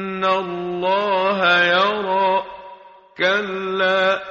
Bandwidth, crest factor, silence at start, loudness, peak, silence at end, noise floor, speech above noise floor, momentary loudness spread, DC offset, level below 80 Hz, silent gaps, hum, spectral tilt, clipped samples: 7.4 kHz; 16 dB; 0 s; -18 LUFS; -4 dBFS; 0 s; -43 dBFS; 24 dB; 9 LU; under 0.1%; -62 dBFS; none; none; -1 dB/octave; under 0.1%